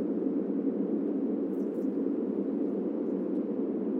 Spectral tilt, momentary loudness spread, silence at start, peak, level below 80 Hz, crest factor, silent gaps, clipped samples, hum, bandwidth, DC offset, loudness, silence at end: -11 dB/octave; 1 LU; 0 s; -18 dBFS; -88 dBFS; 12 dB; none; under 0.1%; none; 3.3 kHz; under 0.1%; -31 LUFS; 0 s